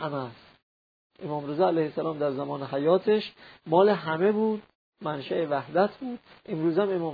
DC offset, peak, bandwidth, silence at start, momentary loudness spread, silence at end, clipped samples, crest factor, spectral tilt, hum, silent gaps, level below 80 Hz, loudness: under 0.1%; -8 dBFS; 5 kHz; 0 s; 15 LU; 0 s; under 0.1%; 18 dB; -9.5 dB/octave; none; 0.63-1.10 s, 4.75-4.92 s; -72 dBFS; -27 LUFS